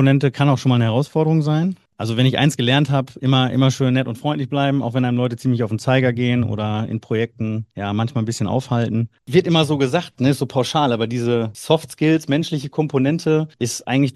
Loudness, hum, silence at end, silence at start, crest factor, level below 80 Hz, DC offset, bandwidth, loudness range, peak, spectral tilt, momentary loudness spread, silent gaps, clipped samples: -19 LUFS; none; 0.05 s; 0 s; 18 dB; -58 dBFS; under 0.1%; 12.5 kHz; 3 LU; 0 dBFS; -6.5 dB/octave; 7 LU; none; under 0.1%